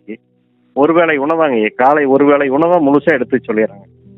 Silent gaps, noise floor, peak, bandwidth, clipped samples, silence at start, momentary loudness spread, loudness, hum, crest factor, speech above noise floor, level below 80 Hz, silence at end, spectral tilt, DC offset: none; -56 dBFS; 0 dBFS; 4.2 kHz; under 0.1%; 0.1 s; 6 LU; -12 LUFS; none; 14 dB; 45 dB; -60 dBFS; 0.45 s; -8.5 dB/octave; under 0.1%